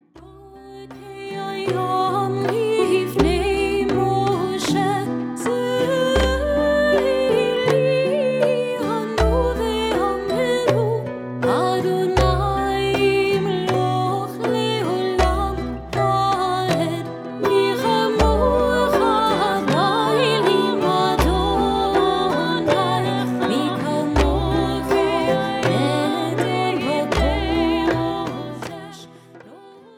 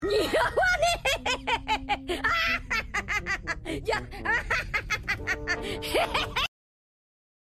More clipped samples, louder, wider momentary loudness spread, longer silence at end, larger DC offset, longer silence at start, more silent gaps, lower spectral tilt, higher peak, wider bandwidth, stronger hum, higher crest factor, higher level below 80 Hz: neither; first, -20 LUFS vs -27 LUFS; about the same, 7 LU vs 6 LU; second, 0.2 s vs 1.1 s; neither; first, 0.15 s vs 0 s; neither; first, -5.5 dB/octave vs -3 dB/octave; first, -2 dBFS vs -12 dBFS; first, 17.5 kHz vs 14.5 kHz; neither; about the same, 18 dB vs 18 dB; first, -32 dBFS vs -42 dBFS